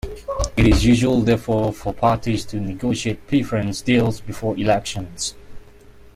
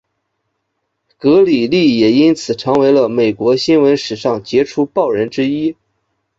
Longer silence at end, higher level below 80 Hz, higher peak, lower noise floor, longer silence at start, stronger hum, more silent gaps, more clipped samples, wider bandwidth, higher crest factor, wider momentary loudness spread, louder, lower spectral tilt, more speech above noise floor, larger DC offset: second, 0.15 s vs 0.65 s; first, -32 dBFS vs -54 dBFS; about the same, -4 dBFS vs -2 dBFS; second, -44 dBFS vs -71 dBFS; second, 0.05 s vs 1.25 s; neither; neither; neither; first, 15 kHz vs 7.8 kHz; about the same, 16 dB vs 12 dB; first, 11 LU vs 7 LU; second, -20 LUFS vs -13 LUFS; about the same, -6 dB/octave vs -6 dB/octave; second, 25 dB vs 58 dB; neither